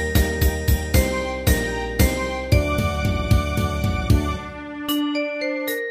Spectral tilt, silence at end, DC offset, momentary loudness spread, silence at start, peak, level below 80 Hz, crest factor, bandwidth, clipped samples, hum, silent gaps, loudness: -5.5 dB/octave; 0 s; under 0.1%; 5 LU; 0 s; -4 dBFS; -26 dBFS; 16 dB; 15.5 kHz; under 0.1%; none; none; -22 LUFS